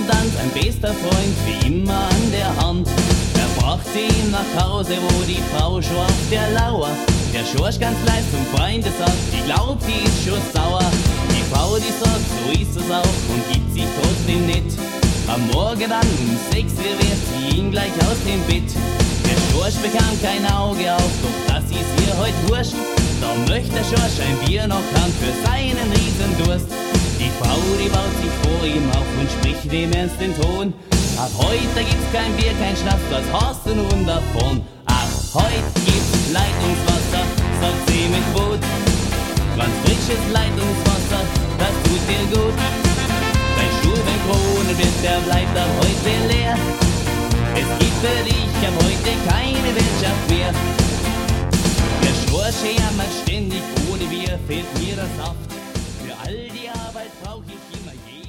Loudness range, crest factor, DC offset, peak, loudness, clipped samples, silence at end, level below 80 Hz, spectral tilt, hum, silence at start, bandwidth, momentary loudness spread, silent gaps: 2 LU; 16 dB; under 0.1%; -2 dBFS; -19 LUFS; under 0.1%; 0 s; -24 dBFS; -5 dB/octave; none; 0 s; 16.5 kHz; 4 LU; none